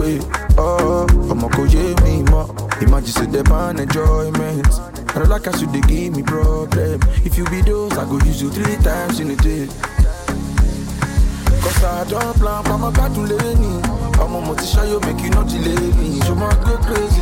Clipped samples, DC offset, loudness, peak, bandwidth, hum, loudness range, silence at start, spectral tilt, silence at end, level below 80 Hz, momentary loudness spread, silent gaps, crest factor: under 0.1%; under 0.1%; -17 LUFS; 0 dBFS; 17 kHz; none; 3 LU; 0 s; -6 dB/octave; 0 s; -18 dBFS; 5 LU; none; 14 dB